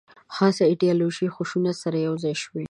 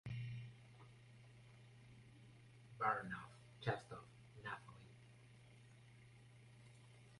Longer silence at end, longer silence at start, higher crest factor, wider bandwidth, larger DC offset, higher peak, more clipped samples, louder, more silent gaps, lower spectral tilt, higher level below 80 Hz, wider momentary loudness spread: about the same, 0.05 s vs 0 s; first, 0.3 s vs 0.05 s; second, 18 dB vs 28 dB; about the same, 11 kHz vs 11.5 kHz; neither; first, -6 dBFS vs -24 dBFS; neither; first, -23 LUFS vs -47 LUFS; neither; about the same, -6 dB/octave vs -6 dB/octave; first, -68 dBFS vs -76 dBFS; second, 8 LU vs 21 LU